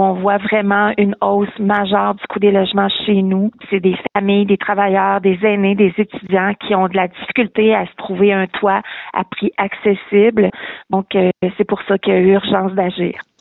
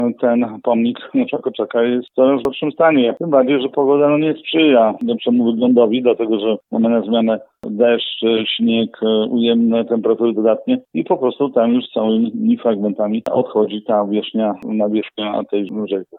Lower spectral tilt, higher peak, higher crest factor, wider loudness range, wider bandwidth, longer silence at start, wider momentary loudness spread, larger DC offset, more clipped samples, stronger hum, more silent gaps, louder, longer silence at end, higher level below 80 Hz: first, -10 dB/octave vs -8.5 dB/octave; about the same, -2 dBFS vs -2 dBFS; about the same, 12 dB vs 14 dB; about the same, 2 LU vs 3 LU; about the same, 4.1 kHz vs 4.1 kHz; about the same, 0 s vs 0 s; about the same, 6 LU vs 7 LU; neither; neither; neither; neither; about the same, -15 LUFS vs -16 LUFS; first, 0.2 s vs 0 s; first, -54 dBFS vs -64 dBFS